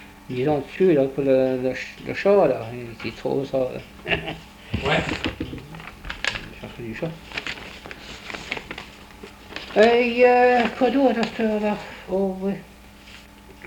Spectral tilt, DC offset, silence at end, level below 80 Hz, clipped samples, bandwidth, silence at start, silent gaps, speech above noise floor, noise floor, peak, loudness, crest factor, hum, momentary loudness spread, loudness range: -6 dB/octave; under 0.1%; 0 s; -46 dBFS; under 0.1%; 19 kHz; 0 s; none; 24 dB; -45 dBFS; -4 dBFS; -22 LUFS; 20 dB; none; 20 LU; 12 LU